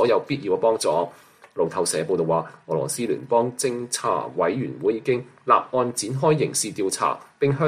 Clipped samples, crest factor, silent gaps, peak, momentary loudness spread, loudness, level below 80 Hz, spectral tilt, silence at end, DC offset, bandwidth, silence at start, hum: under 0.1%; 18 dB; none; -4 dBFS; 6 LU; -23 LUFS; -64 dBFS; -4.5 dB/octave; 0 s; under 0.1%; 15 kHz; 0 s; none